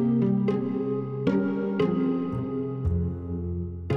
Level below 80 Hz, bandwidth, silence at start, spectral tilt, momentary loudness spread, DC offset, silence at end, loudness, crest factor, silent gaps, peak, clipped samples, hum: -42 dBFS; 6 kHz; 0 s; -10 dB/octave; 8 LU; under 0.1%; 0 s; -27 LUFS; 14 dB; none; -12 dBFS; under 0.1%; none